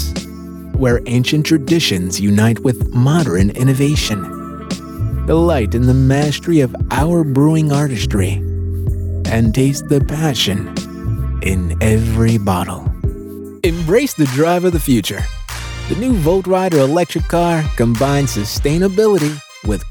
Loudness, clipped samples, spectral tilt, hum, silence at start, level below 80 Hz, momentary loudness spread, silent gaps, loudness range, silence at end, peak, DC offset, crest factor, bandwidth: -15 LUFS; under 0.1%; -6 dB/octave; none; 0 s; -26 dBFS; 10 LU; none; 3 LU; 0 s; 0 dBFS; under 0.1%; 14 dB; 19 kHz